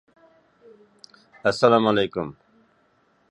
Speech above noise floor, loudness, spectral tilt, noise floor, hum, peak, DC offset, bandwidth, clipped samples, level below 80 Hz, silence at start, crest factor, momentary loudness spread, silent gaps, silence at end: 42 dB; -21 LUFS; -5.5 dB/octave; -64 dBFS; none; -2 dBFS; under 0.1%; 11 kHz; under 0.1%; -62 dBFS; 1.45 s; 22 dB; 14 LU; none; 1 s